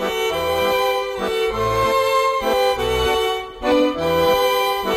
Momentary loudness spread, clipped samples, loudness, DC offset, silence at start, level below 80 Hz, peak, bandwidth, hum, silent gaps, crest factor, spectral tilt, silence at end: 4 LU; under 0.1%; -19 LUFS; under 0.1%; 0 s; -38 dBFS; -6 dBFS; 16.5 kHz; none; none; 12 dB; -4 dB/octave; 0 s